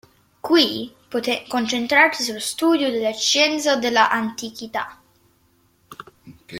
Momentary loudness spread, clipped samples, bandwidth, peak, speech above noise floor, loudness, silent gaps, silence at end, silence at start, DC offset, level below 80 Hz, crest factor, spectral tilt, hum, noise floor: 13 LU; under 0.1%; 16.5 kHz; -2 dBFS; 41 dB; -19 LUFS; none; 0 s; 0.45 s; under 0.1%; -64 dBFS; 20 dB; -2 dB/octave; none; -61 dBFS